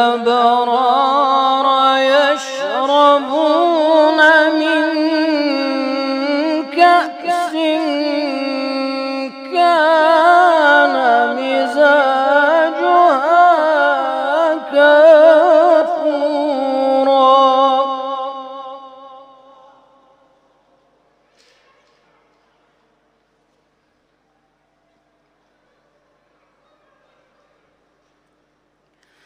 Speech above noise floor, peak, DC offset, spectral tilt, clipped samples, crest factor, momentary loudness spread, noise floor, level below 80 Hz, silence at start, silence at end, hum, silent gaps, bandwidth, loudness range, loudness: 50 dB; 0 dBFS; under 0.1%; -2.5 dB/octave; under 0.1%; 14 dB; 10 LU; -62 dBFS; -74 dBFS; 0 s; 10.15 s; none; none; 10.5 kHz; 5 LU; -13 LUFS